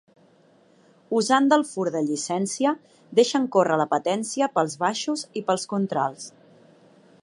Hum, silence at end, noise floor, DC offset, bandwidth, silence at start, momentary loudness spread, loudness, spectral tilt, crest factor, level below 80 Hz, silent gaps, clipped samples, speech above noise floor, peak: none; 0.95 s; -58 dBFS; under 0.1%; 11.5 kHz; 1.1 s; 8 LU; -24 LUFS; -4 dB/octave; 20 dB; -78 dBFS; none; under 0.1%; 34 dB; -6 dBFS